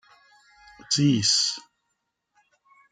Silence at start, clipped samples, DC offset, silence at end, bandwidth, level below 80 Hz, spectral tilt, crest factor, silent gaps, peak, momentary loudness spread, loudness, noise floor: 0.9 s; under 0.1%; under 0.1%; 1.3 s; 11 kHz; -68 dBFS; -3 dB/octave; 20 dB; none; -8 dBFS; 8 LU; -22 LUFS; -78 dBFS